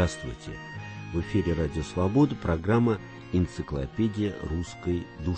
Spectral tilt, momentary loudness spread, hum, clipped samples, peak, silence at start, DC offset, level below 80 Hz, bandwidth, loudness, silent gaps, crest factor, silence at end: -7.5 dB/octave; 14 LU; none; under 0.1%; -10 dBFS; 0 s; under 0.1%; -42 dBFS; 8.8 kHz; -28 LUFS; none; 16 dB; 0 s